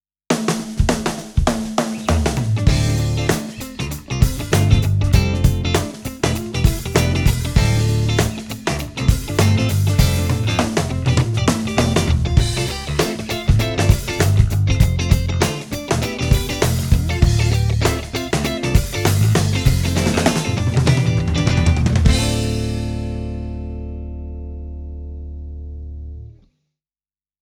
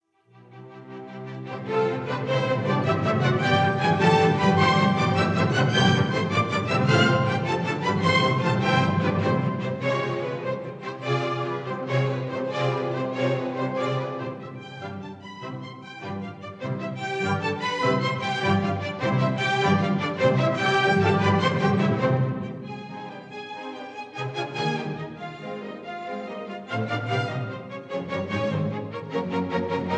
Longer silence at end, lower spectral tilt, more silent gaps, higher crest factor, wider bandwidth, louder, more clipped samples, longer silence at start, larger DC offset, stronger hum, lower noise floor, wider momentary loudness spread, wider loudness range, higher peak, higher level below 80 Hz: first, 1.1 s vs 0 s; about the same, -5.5 dB/octave vs -6.5 dB/octave; neither; about the same, 18 dB vs 18 dB; first, 19.5 kHz vs 9.2 kHz; first, -18 LUFS vs -24 LUFS; neither; second, 0.3 s vs 0.5 s; neither; neither; first, under -90 dBFS vs -54 dBFS; second, 13 LU vs 16 LU; second, 5 LU vs 11 LU; first, 0 dBFS vs -6 dBFS; first, -26 dBFS vs -62 dBFS